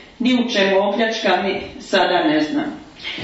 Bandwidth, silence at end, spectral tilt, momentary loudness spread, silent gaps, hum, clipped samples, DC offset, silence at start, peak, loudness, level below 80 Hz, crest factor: 8 kHz; 0 s; -4.5 dB/octave; 11 LU; none; none; under 0.1%; under 0.1%; 0 s; -4 dBFS; -18 LUFS; -54 dBFS; 16 dB